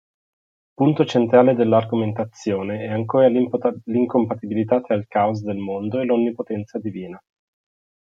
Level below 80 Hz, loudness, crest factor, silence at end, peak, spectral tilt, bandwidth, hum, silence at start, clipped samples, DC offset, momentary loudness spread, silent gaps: -66 dBFS; -20 LUFS; 18 dB; 0.85 s; -2 dBFS; -8 dB/octave; 7.4 kHz; none; 0.8 s; under 0.1%; under 0.1%; 12 LU; none